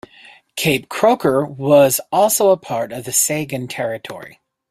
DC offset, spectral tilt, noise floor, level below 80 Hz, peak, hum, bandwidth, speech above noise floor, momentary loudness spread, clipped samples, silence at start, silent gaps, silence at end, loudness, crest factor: under 0.1%; -3.5 dB/octave; -46 dBFS; -58 dBFS; 0 dBFS; none; 16 kHz; 29 dB; 13 LU; under 0.1%; 0.55 s; none; 0.4 s; -16 LUFS; 16 dB